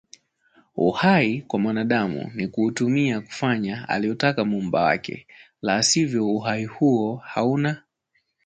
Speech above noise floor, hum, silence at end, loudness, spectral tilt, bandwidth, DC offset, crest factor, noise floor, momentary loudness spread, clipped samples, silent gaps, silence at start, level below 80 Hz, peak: 49 dB; none; 0.65 s; -22 LUFS; -4.5 dB/octave; 9.6 kHz; under 0.1%; 18 dB; -71 dBFS; 9 LU; under 0.1%; none; 0.75 s; -60 dBFS; -4 dBFS